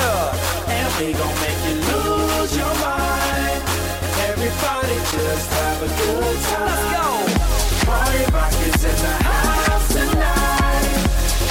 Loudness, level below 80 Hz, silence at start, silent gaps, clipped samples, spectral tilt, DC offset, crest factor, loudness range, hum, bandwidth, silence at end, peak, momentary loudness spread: -19 LUFS; -22 dBFS; 0 s; none; under 0.1%; -4 dB/octave; under 0.1%; 12 dB; 2 LU; none; 17 kHz; 0 s; -6 dBFS; 3 LU